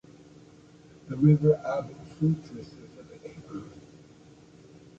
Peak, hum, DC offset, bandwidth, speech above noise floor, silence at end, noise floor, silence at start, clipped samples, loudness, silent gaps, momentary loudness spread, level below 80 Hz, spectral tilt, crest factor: -10 dBFS; none; under 0.1%; 7.4 kHz; 28 dB; 1.2 s; -53 dBFS; 1.1 s; under 0.1%; -26 LUFS; none; 25 LU; -62 dBFS; -10 dB/octave; 20 dB